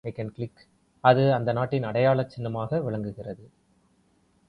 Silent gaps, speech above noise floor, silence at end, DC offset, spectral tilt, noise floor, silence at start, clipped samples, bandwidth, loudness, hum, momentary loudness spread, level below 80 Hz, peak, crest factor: none; 40 dB; 1.05 s; under 0.1%; -9 dB/octave; -65 dBFS; 0.05 s; under 0.1%; 5.6 kHz; -25 LUFS; none; 17 LU; -60 dBFS; -4 dBFS; 24 dB